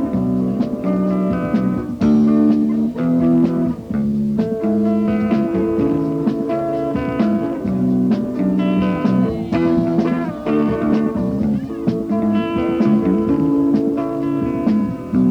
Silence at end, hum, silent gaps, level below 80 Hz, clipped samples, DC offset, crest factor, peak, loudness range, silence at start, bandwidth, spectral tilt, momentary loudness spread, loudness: 0 s; none; none; -42 dBFS; under 0.1%; under 0.1%; 14 dB; -4 dBFS; 2 LU; 0 s; 6.6 kHz; -9.5 dB/octave; 5 LU; -18 LUFS